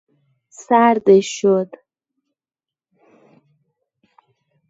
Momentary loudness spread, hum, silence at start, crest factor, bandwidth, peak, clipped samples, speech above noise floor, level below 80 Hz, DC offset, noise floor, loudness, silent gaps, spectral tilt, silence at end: 7 LU; none; 0.6 s; 20 dB; 8 kHz; 0 dBFS; under 0.1%; over 75 dB; -68 dBFS; under 0.1%; under -90 dBFS; -15 LUFS; none; -5.5 dB/octave; 3.05 s